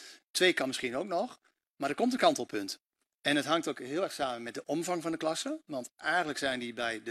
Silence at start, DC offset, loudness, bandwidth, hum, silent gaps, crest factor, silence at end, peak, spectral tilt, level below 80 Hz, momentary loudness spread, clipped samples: 0 s; under 0.1%; -32 LUFS; 14.5 kHz; none; 0.29-0.34 s, 1.70-1.75 s, 2.86-2.90 s, 3.15-3.19 s; 22 dB; 0 s; -10 dBFS; -3 dB/octave; -74 dBFS; 11 LU; under 0.1%